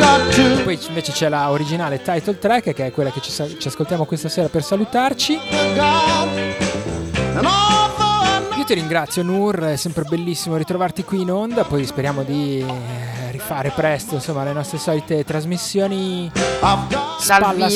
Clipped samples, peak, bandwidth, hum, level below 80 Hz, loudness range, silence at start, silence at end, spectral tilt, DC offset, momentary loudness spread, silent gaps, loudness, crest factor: under 0.1%; -2 dBFS; 16 kHz; none; -42 dBFS; 5 LU; 0 s; 0 s; -4.5 dB/octave; under 0.1%; 9 LU; none; -19 LUFS; 18 dB